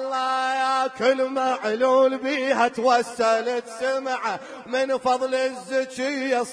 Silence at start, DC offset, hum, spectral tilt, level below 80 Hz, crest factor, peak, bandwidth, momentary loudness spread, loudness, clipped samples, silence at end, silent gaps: 0 s; under 0.1%; none; -3 dB/octave; -70 dBFS; 16 dB; -8 dBFS; 10.5 kHz; 7 LU; -23 LUFS; under 0.1%; 0 s; none